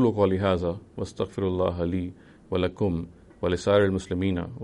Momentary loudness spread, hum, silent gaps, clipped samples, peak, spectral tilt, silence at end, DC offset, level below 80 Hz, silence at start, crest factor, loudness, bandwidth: 11 LU; none; none; under 0.1%; -10 dBFS; -7 dB/octave; 0 s; under 0.1%; -48 dBFS; 0 s; 16 dB; -26 LUFS; 11 kHz